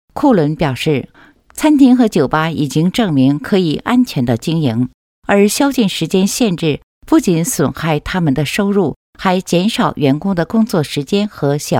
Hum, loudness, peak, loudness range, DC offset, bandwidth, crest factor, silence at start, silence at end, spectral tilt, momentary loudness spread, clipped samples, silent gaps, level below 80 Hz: none; -14 LUFS; 0 dBFS; 2 LU; under 0.1%; 17 kHz; 14 dB; 0.15 s; 0 s; -5.5 dB/octave; 6 LU; under 0.1%; 4.94-5.22 s, 6.83-7.01 s, 8.96-9.13 s; -42 dBFS